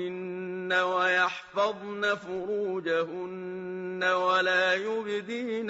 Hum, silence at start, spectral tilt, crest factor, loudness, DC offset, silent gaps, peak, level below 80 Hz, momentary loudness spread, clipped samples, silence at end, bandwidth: none; 0 s; -1.5 dB/octave; 16 dB; -28 LUFS; under 0.1%; none; -14 dBFS; -74 dBFS; 12 LU; under 0.1%; 0 s; 8 kHz